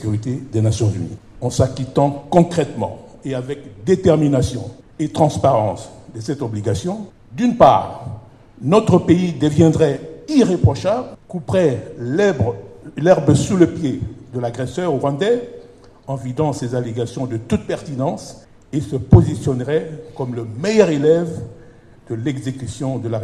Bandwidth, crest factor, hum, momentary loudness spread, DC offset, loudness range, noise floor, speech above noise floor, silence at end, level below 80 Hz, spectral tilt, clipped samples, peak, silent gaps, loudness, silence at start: 12 kHz; 18 dB; none; 16 LU; under 0.1%; 6 LU; -44 dBFS; 26 dB; 0 s; -40 dBFS; -7 dB/octave; under 0.1%; 0 dBFS; none; -18 LUFS; 0 s